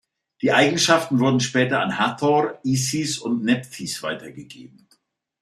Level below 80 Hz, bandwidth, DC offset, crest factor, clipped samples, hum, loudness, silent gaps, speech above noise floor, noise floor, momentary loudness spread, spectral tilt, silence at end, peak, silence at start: -64 dBFS; 14.5 kHz; under 0.1%; 20 dB; under 0.1%; none; -21 LUFS; none; 43 dB; -64 dBFS; 12 LU; -4 dB/octave; 0.75 s; -2 dBFS; 0.4 s